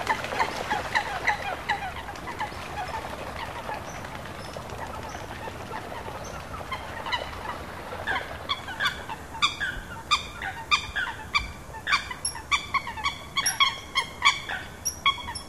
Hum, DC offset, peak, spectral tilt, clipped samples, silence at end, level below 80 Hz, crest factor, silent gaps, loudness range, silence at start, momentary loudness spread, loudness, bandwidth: none; 0.2%; -6 dBFS; -2 dB/octave; under 0.1%; 0 s; -48 dBFS; 24 dB; none; 10 LU; 0 s; 13 LU; -29 LUFS; 15 kHz